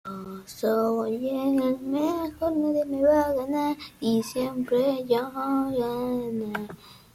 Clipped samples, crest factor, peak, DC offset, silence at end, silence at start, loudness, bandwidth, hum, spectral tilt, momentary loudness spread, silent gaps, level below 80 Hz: under 0.1%; 16 dB; -10 dBFS; under 0.1%; 0.2 s; 0.05 s; -26 LUFS; 16 kHz; none; -6 dB/octave; 8 LU; none; -58 dBFS